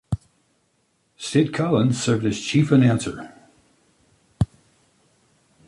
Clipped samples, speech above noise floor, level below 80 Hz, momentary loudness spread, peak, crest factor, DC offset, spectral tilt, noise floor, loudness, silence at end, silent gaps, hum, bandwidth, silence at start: under 0.1%; 48 dB; -46 dBFS; 15 LU; -4 dBFS; 20 dB; under 0.1%; -6 dB/octave; -67 dBFS; -21 LUFS; 1.2 s; none; none; 11.5 kHz; 0.1 s